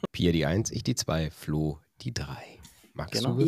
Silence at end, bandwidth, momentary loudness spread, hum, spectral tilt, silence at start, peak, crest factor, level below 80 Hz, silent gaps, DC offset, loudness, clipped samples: 0 s; 15.5 kHz; 14 LU; none; -5 dB/octave; 0.05 s; -12 dBFS; 18 dB; -46 dBFS; none; under 0.1%; -30 LUFS; under 0.1%